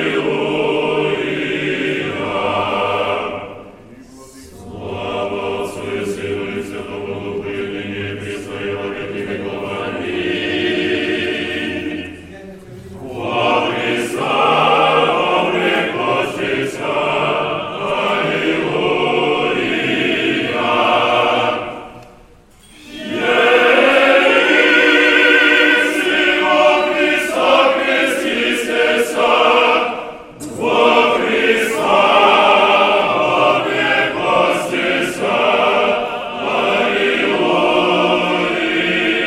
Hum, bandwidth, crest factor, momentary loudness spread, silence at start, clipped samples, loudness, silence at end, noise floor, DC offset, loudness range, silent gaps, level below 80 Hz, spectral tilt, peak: none; 16 kHz; 16 dB; 14 LU; 0 s; under 0.1%; -15 LUFS; 0 s; -45 dBFS; under 0.1%; 12 LU; none; -50 dBFS; -4 dB/octave; 0 dBFS